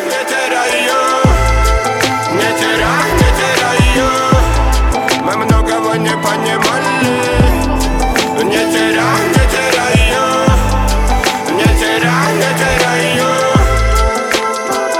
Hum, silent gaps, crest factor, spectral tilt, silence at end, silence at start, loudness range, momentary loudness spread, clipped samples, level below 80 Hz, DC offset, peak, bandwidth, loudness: none; none; 12 dB; -4.5 dB/octave; 0 s; 0 s; 1 LU; 3 LU; under 0.1%; -18 dBFS; under 0.1%; 0 dBFS; 17 kHz; -12 LUFS